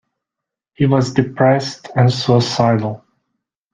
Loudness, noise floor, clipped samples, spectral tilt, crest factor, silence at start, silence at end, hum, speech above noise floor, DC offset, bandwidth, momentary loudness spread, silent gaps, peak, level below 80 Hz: -16 LUFS; -84 dBFS; under 0.1%; -6.5 dB/octave; 16 dB; 0.8 s; 0.75 s; none; 69 dB; under 0.1%; 9.2 kHz; 7 LU; none; 0 dBFS; -52 dBFS